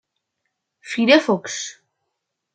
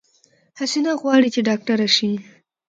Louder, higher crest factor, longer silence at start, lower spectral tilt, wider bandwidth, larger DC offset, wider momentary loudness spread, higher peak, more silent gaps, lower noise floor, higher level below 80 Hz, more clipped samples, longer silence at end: about the same, -18 LUFS vs -19 LUFS; about the same, 20 dB vs 18 dB; first, 0.85 s vs 0.55 s; about the same, -3.5 dB/octave vs -4 dB/octave; about the same, 9.4 kHz vs 9.2 kHz; neither; first, 14 LU vs 9 LU; about the same, -2 dBFS vs -4 dBFS; neither; first, -78 dBFS vs -59 dBFS; about the same, -72 dBFS vs -70 dBFS; neither; first, 0.85 s vs 0.45 s